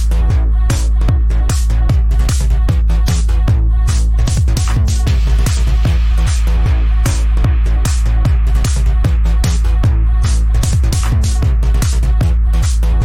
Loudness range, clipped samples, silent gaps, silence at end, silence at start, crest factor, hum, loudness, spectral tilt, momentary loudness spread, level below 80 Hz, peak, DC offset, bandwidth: 0 LU; under 0.1%; none; 0 s; 0 s; 8 dB; none; -14 LUFS; -5.5 dB/octave; 1 LU; -12 dBFS; -2 dBFS; under 0.1%; 13 kHz